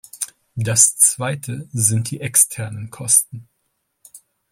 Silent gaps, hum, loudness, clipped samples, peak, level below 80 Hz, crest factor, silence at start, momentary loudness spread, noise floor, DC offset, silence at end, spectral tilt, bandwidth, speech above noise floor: none; none; -16 LUFS; under 0.1%; 0 dBFS; -58 dBFS; 20 dB; 0.15 s; 16 LU; -71 dBFS; under 0.1%; 0.35 s; -3 dB/octave; 16.5 kHz; 53 dB